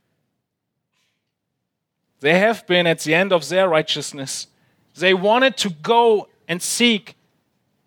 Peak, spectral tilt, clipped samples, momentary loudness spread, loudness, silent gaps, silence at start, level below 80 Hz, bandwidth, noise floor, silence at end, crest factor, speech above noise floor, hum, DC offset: -2 dBFS; -3.5 dB/octave; under 0.1%; 11 LU; -18 LUFS; none; 2.2 s; -74 dBFS; 19.5 kHz; -78 dBFS; 0.75 s; 20 dB; 60 dB; none; under 0.1%